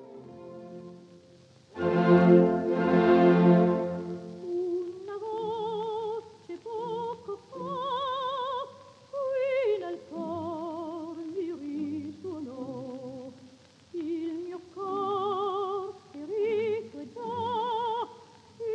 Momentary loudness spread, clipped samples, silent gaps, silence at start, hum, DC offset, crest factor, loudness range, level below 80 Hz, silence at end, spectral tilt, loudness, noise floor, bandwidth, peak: 21 LU; under 0.1%; none; 0 s; none; under 0.1%; 22 dB; 14 LU; -72 dBFS; 0 s; -8.5 dB/octave; -29 LUFS; -56 dBFS; 7.4 kHz; -8 dBFS